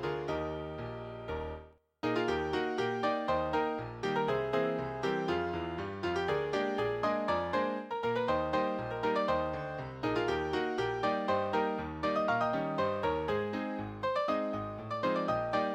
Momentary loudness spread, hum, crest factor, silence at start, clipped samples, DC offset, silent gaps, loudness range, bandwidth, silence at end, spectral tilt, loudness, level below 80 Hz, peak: 7 LU; none; 16 dB; 0 s; under 0.1%; under 0.1%; none; 1 LU; 15.5 kHz; 0 s; -6.5 dB/octave; -33 LUFS; -56 dBFS; -16 dBFS